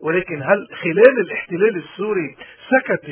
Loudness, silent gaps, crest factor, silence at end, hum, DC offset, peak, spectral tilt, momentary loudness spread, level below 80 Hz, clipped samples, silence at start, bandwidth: -18 LUFS; none; 18 dB; 0 s; none; under 0.1%; 0 dBFS; -10 dB/octave; 11 LU; -62 dBFS; under 0.1%; 0 s; 4 kHz